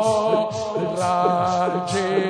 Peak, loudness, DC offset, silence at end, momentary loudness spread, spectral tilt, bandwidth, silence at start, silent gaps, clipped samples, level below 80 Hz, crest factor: -4 dBFS; -21 LUFS; under 0.1%; 0 s; 5 LU; -5 dB/octave; 10.5 kHz; 0 s; none; under 0.1%; -60 dBFS; 16 dB